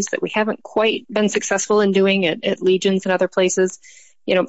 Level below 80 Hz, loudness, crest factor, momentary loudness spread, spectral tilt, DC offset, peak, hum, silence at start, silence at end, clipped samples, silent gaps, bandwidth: -66 dBFS; -18 LUFS; 12 dB; 6 LU; -4 dB/octave; 0.2%; -6 dBFS; none; 0 s; 0 s; under 0.1%; none; 8.2 kHz